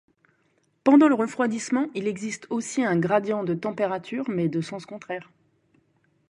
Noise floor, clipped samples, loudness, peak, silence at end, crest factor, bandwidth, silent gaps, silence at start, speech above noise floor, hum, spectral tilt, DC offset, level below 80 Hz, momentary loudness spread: -68 dBFS; under 0.1%; -24 LUFS; -4 dBFS; 1.05 s; 20 dB; 11 kHz; none; 0.85 s; 44 dB; none; -6 dB/octave; under 0.1%; -70 dBFS; 17 LU